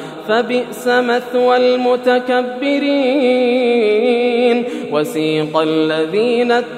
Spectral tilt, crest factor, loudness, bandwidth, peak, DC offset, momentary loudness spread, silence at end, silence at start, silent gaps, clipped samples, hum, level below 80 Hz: -5 dB/octave; 14 dB; -15 LUFS; 15 kHz; 0 dBFS; under 0.1%; 5 LU; 0 s; 0 s; none; under 0.1%; none; -74 dBFS